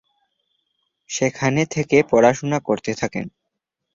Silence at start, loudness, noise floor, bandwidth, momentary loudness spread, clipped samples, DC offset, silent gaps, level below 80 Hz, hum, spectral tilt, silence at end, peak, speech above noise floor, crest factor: 1.1 s; -20 LUFS; -79 dBFS; 7.6 kHz; 13 LU; under 0.1%; under 0.1%; none; -56 dBFS; none; -5.5 dB/octave; 0.65 s; -2 dBFS; 60 dB; 20 dB